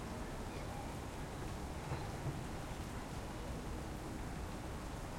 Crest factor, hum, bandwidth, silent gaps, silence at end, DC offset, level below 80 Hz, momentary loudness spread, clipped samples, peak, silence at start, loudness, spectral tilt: 14 dB; none; 16.5 kHz; none; 0 s; under 0.1%; -50 dBFS; 2 LU; under 0.1%; -30 dBFS; 0 s; -45 LUFS; -5.5 dB/octave